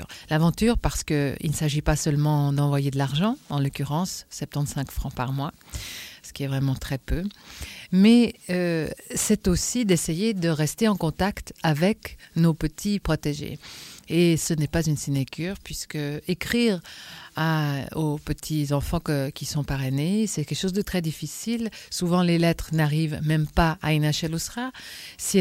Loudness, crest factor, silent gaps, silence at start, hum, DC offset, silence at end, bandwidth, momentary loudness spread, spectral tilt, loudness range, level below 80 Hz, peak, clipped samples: -25 LUFS; 18 dB; none; 0 s; none; under 0.1%; 0 s; 16.5 kHz; 11 LU; -5.5 dB/octave; 5 LU; -40 dBFS; -6 dBFS; under 0.1%